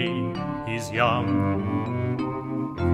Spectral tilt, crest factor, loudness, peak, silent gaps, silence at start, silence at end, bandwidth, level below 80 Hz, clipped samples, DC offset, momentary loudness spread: -7 dB/octave; 18 dB; -26 LUFS; -8 dBFS; none; 0 s; 0 s; 14 kHz; -48 dBFS; under 0.1%; under 0.1%; 7 LU